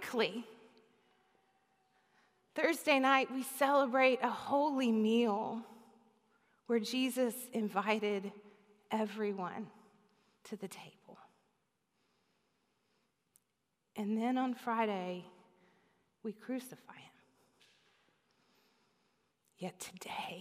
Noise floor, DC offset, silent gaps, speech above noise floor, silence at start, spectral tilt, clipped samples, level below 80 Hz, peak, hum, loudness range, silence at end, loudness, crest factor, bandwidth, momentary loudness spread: -84 dBFS; under 0.1%; none; 49 dB; 0 s; -4.5 dB/octave; under 0.1%; under -90 dBFS; -14 dBFS; none; 20 LU; 0 s; -35 LUFS; 24 dB; 15.5 kHz; 18 LU